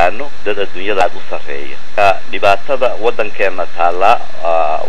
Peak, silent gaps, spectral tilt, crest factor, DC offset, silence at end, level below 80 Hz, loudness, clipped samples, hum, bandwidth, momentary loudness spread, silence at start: 0 dBFS; none; -4.5 dB/octave; 18 dB; 40%; 0 s; -48 dBFS; -15 LUFS; 0.5%; none; 13.5 kHz; 11 LU; 0 s